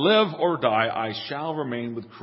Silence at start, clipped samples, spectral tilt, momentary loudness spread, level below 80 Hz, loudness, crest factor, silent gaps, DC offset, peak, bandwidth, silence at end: 0 s; under 0.1%; -9.5 dB/octave; 10 LU; -68 dBFS; -25 LUFS; 18 dB; none; under 0.1%; -6 dBFS; 5.8 kHz; 0 s